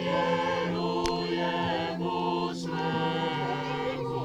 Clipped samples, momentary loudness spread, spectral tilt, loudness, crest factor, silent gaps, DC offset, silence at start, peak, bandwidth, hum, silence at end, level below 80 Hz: under 0.1%; 4 LU; -5.5 dB/octave; -29 LUFS; 16 dB; none; under 0.1%; 0 s; -12 dBFS; 12 kHz; none; 0 s; -54 dBFS